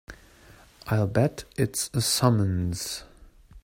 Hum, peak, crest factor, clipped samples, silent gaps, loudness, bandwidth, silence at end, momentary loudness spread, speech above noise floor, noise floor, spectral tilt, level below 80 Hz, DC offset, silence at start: none; -6 dBFS; 20 dB; under 0.1%; none; -26 LUFS; 16.5 kHz; 0.05 s; 11 LU; 28 dB; -53 dBFS; -5 dB/octave; -52 dBFS; under 0.1%; 0.1 s